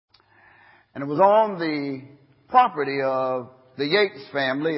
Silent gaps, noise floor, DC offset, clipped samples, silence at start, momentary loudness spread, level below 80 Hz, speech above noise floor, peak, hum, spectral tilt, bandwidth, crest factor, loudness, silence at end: none; -56 dBFS; under 0.1%; under 0.1%; 0.95 s; 16 LU; -72 dBFS; 34 dB; -4 dBFS; none; -9.5 dB/octave; 5.8 kHz; 20 dB; -22 LUFS; 0 s